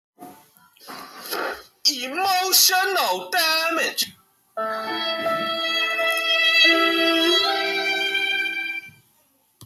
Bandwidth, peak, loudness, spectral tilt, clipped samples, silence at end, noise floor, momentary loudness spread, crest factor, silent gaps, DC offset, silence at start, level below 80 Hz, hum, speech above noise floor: 17.5 kHz; -4 dBFS; -19 LUFS; 0 dB/octave; under 0.1%; 0 s; -63 dBFS; 15 LU; 18 dB; none; under 0.1%; 0.2 s; -70 dBFS; none; 42 dB